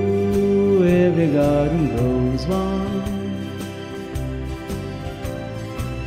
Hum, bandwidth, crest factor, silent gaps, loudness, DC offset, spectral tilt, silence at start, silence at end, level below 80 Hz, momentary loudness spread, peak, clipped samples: none; 15.5 kHz; 14 dB; none; -21 LUFS; under 0.1%; -8 dB/octave; 0 s; 0 s; -34 dBFS; 13 LU; -6 dBFS; under 0.1%